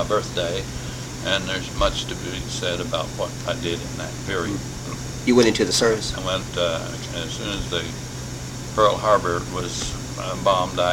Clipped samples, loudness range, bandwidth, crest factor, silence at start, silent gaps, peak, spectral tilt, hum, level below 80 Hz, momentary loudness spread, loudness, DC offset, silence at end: under 0.1%; 4 LU; 17 kHz; 20 dB; 0 s; none; -4 dBFS; -4 dB/octave; none; -38 dBFS; 12 LU; -23 LUFS; under 0.1%; 0 s